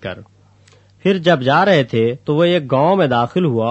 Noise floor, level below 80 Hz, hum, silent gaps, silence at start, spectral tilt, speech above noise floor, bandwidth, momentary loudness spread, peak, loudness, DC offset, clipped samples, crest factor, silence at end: -49 dBFS; -58 dBFS; none; none; 0 s; -7.5 dB/octave; 35 dB; 8.2 kHz; 6 LU; 0 dBFS; -15 LUFS; under 0.1%; under 0.1%; 16 dB; 0 s